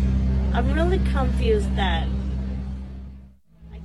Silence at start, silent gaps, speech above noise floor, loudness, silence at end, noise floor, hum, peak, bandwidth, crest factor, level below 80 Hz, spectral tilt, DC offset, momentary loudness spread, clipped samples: 0 s; none; 26 dB; -23 LUFS; 0 s; -47 dBFS; none; -10 dBFS; 10.5 kHz; 14 dB; -26 dBFS; -7.5 dB/octave; under 0.1%; 16 LU; under 0.1%